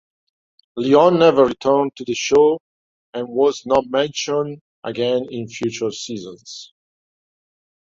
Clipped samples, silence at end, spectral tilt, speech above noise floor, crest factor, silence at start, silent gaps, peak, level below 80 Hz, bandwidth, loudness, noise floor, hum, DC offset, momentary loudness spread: under 0.1%; 1.3 s; -4.5 dB/octave; over 72 dB; 18 dB; 0.75 s; 2.60-3.13 s, 4.61-4.82 s; -2 dBFS; -58 dBFS; 7.8 kHz; -18 LUFS; under -90 dBFS; none; under 0.1%; 19 LU